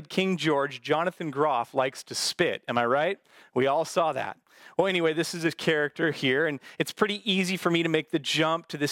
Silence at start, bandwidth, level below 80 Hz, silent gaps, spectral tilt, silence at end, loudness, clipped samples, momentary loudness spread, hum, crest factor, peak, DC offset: 0 s; 17 kHz; -74 dBFS; none; -4.5 dB/octave; 0 s; -27 LUFS; under 0.1%; 5 LU; none; 20 dB; -6 dBFS; under 0.1%